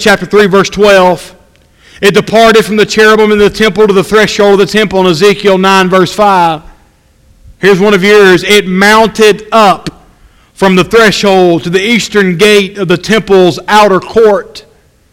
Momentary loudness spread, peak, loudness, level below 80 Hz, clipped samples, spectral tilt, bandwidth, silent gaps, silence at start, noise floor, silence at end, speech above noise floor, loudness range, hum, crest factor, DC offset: 5 LU; 0 dBFS; -6 LUFS; -36 dBFS; 4%; -4.5 dB/octave; 16.5 kHz; none; 0 s; -45 dBFS; 0.5 s; 39 dB; 2 LU; none; 6 dB; under 0.1%